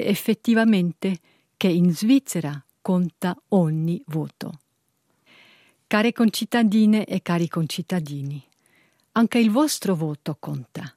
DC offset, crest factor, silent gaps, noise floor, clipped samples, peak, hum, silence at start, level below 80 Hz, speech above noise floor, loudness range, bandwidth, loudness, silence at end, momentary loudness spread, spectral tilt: under 0.1%; 18 dB; none; -70 dBFS; under 0.1%; -4 dBFS; none; 0 s; -70 dBFS; 49 dB; 4 LU; 16 kHz; -22 LUFS; 0.1 s; 14 LU; -6 dB/octave